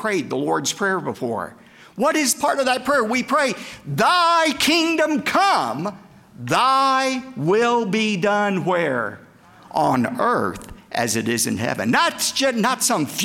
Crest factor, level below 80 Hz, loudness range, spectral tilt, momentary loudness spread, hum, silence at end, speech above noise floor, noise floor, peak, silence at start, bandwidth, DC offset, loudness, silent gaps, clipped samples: 14 dB; -58 dBFS; 3 LU; -3.5 dB/octave; 11 LU; none; 0 s; 26 dB; -46 dBFS; -6 dBFS; 0 s; 17 kHz; under 0.1%; -20 LUFS; none; under 0.1%